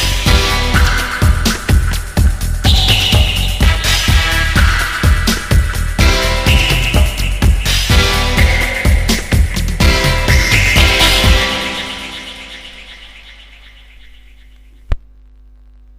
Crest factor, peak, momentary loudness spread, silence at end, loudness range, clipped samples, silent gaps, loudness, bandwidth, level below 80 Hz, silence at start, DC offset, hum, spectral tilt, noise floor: 12 dB; 0 dBFS; 15 LU; 1 s; 12 LU; under 0.1%; none; -12 LUFS; 16.5 kHz; -16 dBFS; 0 s; under 0.1%; none; -3.5 dB/octave; -41 dBFS